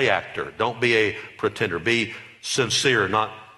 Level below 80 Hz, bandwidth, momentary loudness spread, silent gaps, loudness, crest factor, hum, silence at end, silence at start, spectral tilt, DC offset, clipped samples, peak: -58 dBFS; 12 kHz; 9 LU; none; -22 LUFS; 20 dB; none; 0.05 s; 0 s; -3.5 dB/octave; under 0.1%; under 0.1%; -4 dBFS